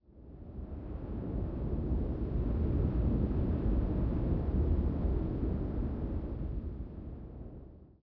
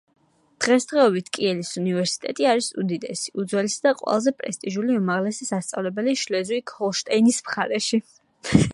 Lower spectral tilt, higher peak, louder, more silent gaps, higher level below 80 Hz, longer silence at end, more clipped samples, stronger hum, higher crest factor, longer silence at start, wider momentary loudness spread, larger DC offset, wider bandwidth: first, -12.5 dB/octave vs -4.5 dB/octave; second, -20 dBFS vs 0 dBFS; second, -35 LUFS vs -23 LUFS; neither; first, -36 dBFS vs -52 dBFS; first, 0.15 s vs 0 s; neither; neither; second, 14 dB vs 22 dB; second, 0.1 s vs 0.6 s; first, 15 LU vs 8 LU; neither; second, 4.1 kHz vs 11.5 kHz